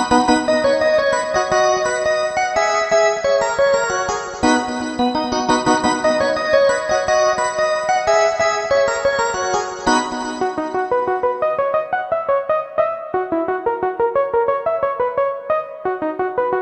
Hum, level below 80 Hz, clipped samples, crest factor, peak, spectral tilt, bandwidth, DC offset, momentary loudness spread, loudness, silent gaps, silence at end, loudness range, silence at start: none; -48 dBFS; under 0.1%; 16 dB; -2 dBFS; -3 dB/octave; 8.8 kHz; under 0.1%; 6 LU; -18 LUFS; none; 0 s; 3 LU; 0 s